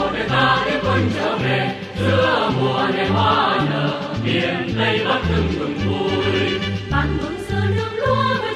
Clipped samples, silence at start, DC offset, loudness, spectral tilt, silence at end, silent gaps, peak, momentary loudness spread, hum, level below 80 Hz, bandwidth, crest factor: under 0.1%; 0 s; under 0.1%; -19 LUFS; -6.5 dB/octave; 0 s; none; -6 dBFS; 6 LU; none; -36 dBFS; 11.5 kHz; 14 dB